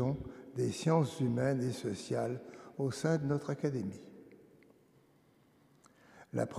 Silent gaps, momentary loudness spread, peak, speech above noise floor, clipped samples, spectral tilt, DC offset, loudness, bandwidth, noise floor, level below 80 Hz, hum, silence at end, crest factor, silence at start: none; 14 LU; -16 dBFS; 33 dB; under 0.1%; -7 dB/octave; under 0.1%; -35 LUFS; 14 kHz; -67 dBFS; -66 dBFS; none; 0 s; 20 dB; 0 s